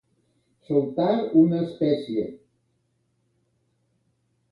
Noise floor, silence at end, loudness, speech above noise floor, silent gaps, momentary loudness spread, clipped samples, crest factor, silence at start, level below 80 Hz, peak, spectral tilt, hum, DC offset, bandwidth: -71 dBFS; 2.15 s; -23 LUFS; 49 dB; none; 10 LU; under 0.1%; 20 dB; 0.7 s; -68 dBFS; -6 dBFS; -9.5 dB/octave; none; under 0.1%; 5.2 kHz